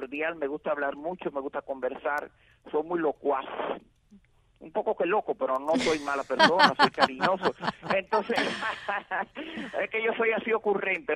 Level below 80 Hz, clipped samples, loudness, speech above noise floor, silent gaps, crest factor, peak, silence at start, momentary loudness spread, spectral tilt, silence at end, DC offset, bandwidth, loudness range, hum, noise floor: -66 dBFS; under 0.1%; -28 LUFS; 31 dB; none; 26 dB; -4 dBFS; 0 s; 12 LU; -4 dB/octave; 0 s; under 0.1%; 12.5 kHz; 8 LU; none; -59 dBFS